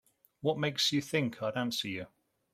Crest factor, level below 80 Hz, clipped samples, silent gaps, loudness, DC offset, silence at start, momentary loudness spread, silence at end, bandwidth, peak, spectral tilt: 18 dB; -72 dBFS; under 0.1%; none; -32 LUFS; under 0.1%; 0.4 s; 10 LU; 0.45 s; 16 kHz; -16 dBFS; -4 dB/octave